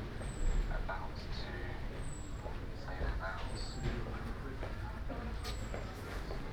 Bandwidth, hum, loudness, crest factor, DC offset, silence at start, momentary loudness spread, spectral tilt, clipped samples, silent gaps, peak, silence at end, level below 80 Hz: 14.5 kHz; none; -43 LUFS; 16 dB; under 0.1%; 0 s; 5 LU; -5.5 dB/octave; under 0.1%; none; -24 dBFS; 0 s; -40 dBFS